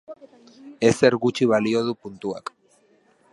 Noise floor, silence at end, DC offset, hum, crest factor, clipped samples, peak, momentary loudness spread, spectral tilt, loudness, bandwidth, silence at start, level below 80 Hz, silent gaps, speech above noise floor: -60 dBFS; 0.95 s; under 0.1%; none; 22 dB; under 0.1%; -2 dBFS; 14 LU; -5.5 dB/octave; -22 LUFS; 11.5 kHz; 0.1 s; -62 dBFS; none; 39 dB